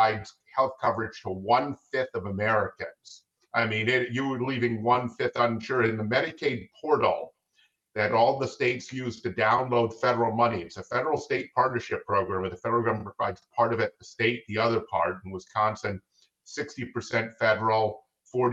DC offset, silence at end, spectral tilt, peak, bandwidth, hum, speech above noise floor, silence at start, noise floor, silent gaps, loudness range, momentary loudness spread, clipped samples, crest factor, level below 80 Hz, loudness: under 0.1%; 0 s; -6 dB/octave; -10 dBFS; 8 kHz; none; 41 dB; 0 s; -68 dBFS; none; 3 LU; 10 LU; under 0.1%; 18 dB; -68 dBFS; -27 LUFS